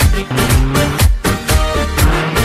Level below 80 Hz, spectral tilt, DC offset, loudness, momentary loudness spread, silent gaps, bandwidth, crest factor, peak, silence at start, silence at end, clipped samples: -16 dBFS; -4.5 dB/octave; under 0.1%; -14 LUFS; 3 LU; none; 16 kHz; 12 dB; 0 dBFS; 0 s; 0 s; under 0.1%